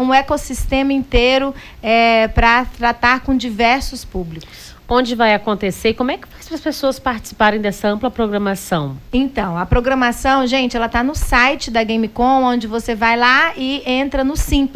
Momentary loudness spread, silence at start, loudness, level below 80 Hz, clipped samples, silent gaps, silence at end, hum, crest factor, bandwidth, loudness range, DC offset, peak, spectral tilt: 9 LU; 0 s; -16 LUFS; -28 dBFS; under 0.1%; none; 0 s; none; 14 dB; 16 kHz; 4 LU; under 0.1%; -2 dBFS; -4.5 dB/octave